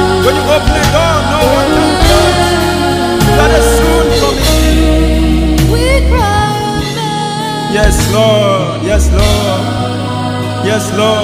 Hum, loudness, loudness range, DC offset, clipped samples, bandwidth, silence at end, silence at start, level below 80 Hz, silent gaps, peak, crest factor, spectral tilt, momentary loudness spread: none; -10 LUFS; 2 LU; under 0.1%; 0.2%; 16.5 kHz; 0 s; 0 s; -16 dBFS; none; 0 dBFS; 10 dB; -5 dB/octave; 7 LU